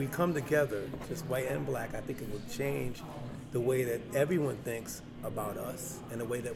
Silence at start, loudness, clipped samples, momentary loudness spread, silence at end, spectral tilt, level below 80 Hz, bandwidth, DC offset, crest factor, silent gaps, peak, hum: 0 s; -35 LUFS; under 0.1%; 10 LU; 0 s; -6 dB/octave; -56 dBFS; 17.5 kHz; under 0.1%; 18 dB; none; -16 dBFS; none